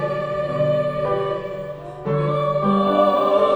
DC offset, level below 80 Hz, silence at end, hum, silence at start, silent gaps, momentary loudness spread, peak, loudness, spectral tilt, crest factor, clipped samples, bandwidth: under 0.1%; -50 dBFS; 0 s; none; 0 s; none; 13 LU; -4 dBFS; -20 LUFS; -8 dB/octave; 16 dB; under 0.1%; over 20 kHz